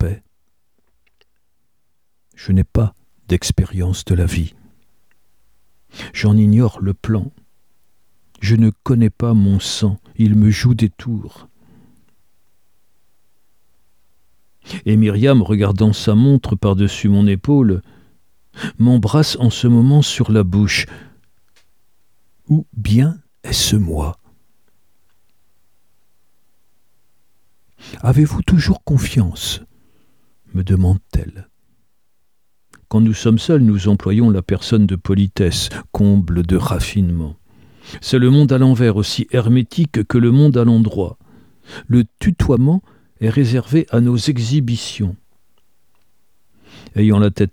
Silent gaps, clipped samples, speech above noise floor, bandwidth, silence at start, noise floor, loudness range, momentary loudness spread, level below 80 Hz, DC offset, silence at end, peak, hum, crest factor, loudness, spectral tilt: none; under 0.1%; 58 dB; 16 kHz; 0 s; -72 dBFS; 7 LU; 12 LU; -34 dBFS; 0.3%; 0.05 s; 0 dBFS; none; 16 dB; -15 LUFS; -6.5 dB/octave